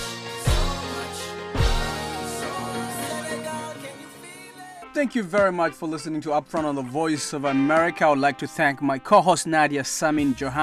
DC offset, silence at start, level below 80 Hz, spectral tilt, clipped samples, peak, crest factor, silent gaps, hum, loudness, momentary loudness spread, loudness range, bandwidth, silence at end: under 0.1%; 0 s; -36 dBFS; -4.5 dB/octave; under 0.1%; -4 dBFS; 20 dB; none; none; -24 LUFS; 13 LU; 8 LU; 15.5 kHz; 0 s